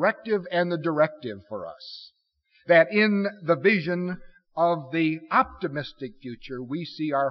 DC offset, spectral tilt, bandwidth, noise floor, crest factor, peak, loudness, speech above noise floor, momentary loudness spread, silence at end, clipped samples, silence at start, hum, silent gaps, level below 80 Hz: under 0.1%; -4.5 dB/octave; 6 kHz; -66 dBFS; 18 dB; -6 dBFS; -24 LUFS; 41 dB; 17 LU; 0 s; under 0.1%; 0 s; none; none; -60 dBFS